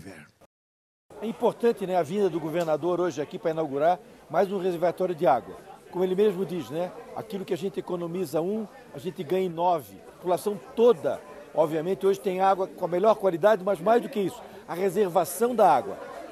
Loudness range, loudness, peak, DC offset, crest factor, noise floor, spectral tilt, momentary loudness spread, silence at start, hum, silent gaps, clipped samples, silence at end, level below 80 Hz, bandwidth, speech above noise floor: 5 LU; -26 LUFS; -8 dBFS; under 0.1%; 18 dB; under -90 dBFS; -6 dB/octave; 14 LU; 0.05 s; none; 0.46-1.09 s; under 0.1%; 0 s; -68 dBFS; 15.5 kHz; over 64 dB